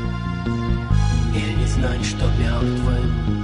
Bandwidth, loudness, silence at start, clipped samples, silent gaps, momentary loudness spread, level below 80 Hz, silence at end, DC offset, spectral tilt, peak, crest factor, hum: 10.5 kHz; -21 LUFS; 0 s; under 0.1%; none; 4 LU; -24 dBFS; 0 s; under 0.1%; -6.5 dB/octave; -4 dBFS; 14 dB; none